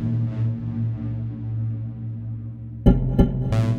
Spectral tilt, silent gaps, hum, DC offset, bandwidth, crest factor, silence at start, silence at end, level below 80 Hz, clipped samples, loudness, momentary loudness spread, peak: -9.5 dB/octave; none; none; under 0.1%; 6.6 kHz; 22 dB; 0 s; 0 s; -30 dBFS; under 0.1%; -24 LUFS; 12 LU; -2 dBFS